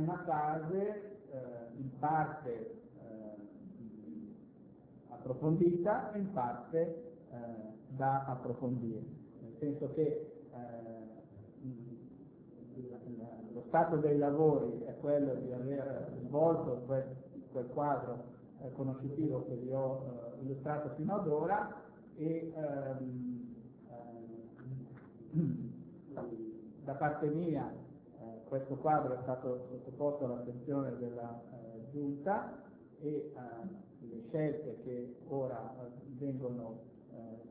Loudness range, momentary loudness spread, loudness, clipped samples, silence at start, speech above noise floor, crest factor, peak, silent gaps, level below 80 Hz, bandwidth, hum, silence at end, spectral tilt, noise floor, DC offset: 8 LU; 19 LU; -38 LUFS; under 0.1%; 0 s; 21 dB; 22 dB; -18 dBFS; none; -72 dBFS; 4 kHz; none; 0 s; -10 dB/octave; -58 dBFS; under 0.1%